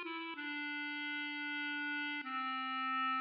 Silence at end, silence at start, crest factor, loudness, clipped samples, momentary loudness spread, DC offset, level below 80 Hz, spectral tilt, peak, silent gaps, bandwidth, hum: 0 s; 0 s; 10 dB; -39 LUFS; under 0.1%; 5 LU; under 0.1%; under -90 dBFS; 3.5 dB/octave; -30 dBFS; none; 5.6 kHz; none